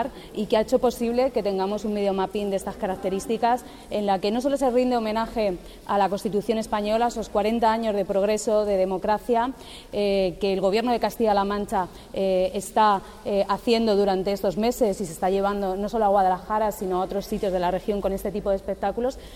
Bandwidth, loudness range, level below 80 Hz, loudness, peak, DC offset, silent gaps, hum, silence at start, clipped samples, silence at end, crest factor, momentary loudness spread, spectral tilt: 16 kHz; 2 LU; -46 dBFS; -24 LUFS; -8 dBFS; under 0.1%; none; none; 0 s; under 0.1%; 0 s; 16 dB; 6 LU; -5.5 dB/octave